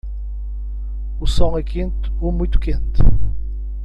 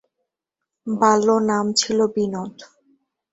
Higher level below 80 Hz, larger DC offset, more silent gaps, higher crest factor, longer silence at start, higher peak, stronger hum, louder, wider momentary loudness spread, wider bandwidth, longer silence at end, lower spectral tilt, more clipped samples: first, -18 dBFS vs -64 dBFS; neither; neither; about the same, 16 dB vs 18 dB; second, 0.05 s vs 0.85 s; first, 0 dBFS vs -4 dBFS; first, 50 Hz at -20 dBFS vs none; second, -23 LUFS vs -19 LUFS; second, 10 LU vs 15 LU; about the same, 8.8 kHz vs 8.2 kHz; second, 0 s vs 0.65 s; first, -7.5 dB/octave vs -4 dB/octave; neither